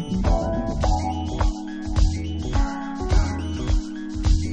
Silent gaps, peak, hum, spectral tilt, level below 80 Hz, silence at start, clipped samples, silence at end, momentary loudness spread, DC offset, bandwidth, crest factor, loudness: none; -6 dBFS; none; -6.5 dB/octave; -24 dBFS; 0 s; under 0.1%; 0 s; 5 LU; under 0.1%; 8.6 kHz; 16 dB; -25 LUFS